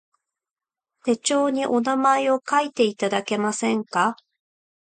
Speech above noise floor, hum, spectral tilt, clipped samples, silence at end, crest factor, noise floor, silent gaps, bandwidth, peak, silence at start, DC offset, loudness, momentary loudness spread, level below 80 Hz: over 68 dB; none; -3.5 dB/octave; under 0.1%; 0.8 s; 16 dB; under -90 dBFS; none; 9.6 kHz; -8 dBFS; 1.05 s; under 0.1%; -22 LUFS; 6 LU; -72 dBFS